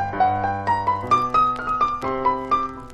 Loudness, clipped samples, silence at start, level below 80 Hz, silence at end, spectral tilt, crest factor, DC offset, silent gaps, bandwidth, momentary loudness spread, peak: -21 LUFS; under 0.1%; 0 s; -46 dBFS; 0 s; -6 dB/octave; 14 dB; under 0.1%; none; 10 kHz; 4 LU; -8 dBFS